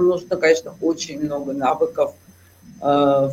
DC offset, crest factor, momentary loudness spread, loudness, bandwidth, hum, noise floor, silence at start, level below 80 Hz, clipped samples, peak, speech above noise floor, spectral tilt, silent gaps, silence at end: under 0.1%; 16 dB; 8 LU; -20 LUFS; 15.5 kHz; none; -47 dBFS; 0 s; -58 dBFS; under 0.1%; -4 dBFS; 27 dB; -5 dB/octave; none; 0 s